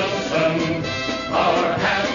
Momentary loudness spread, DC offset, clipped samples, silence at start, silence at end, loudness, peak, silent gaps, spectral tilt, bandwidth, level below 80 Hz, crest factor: 5 LU; under 0.1%; under 0.1%; 0 s; 0 s; -20 LUFS; -6 dBFS; none; -4.5 dB/octave; 7.4 kHz; -48 dBFS; 14 dB